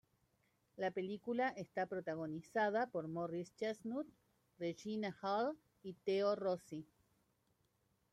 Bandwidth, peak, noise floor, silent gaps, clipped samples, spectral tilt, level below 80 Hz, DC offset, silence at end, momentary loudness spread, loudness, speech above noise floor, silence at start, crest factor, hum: 13 kHz; -24 dBFS; -80 dBFS; none; under 0.1%; -6 dB/octave; -84 dBFS; under 0.1%; 1.3 s; 9 LU; -42 LUFS; 39 dB; 0.75 s; 18 dB; none